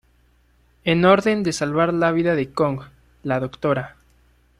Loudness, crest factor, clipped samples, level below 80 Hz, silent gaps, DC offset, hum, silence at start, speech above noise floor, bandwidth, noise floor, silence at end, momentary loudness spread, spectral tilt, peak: -20 LUFS; 20 dB; under 0.1%; -52 dBFS; none; under 0.1%; none; 0.85 s; 39 dB; 13 kHz; -58 dBFS; 0.7 s; 12 LU; -6 dB/octave; -2 dBFS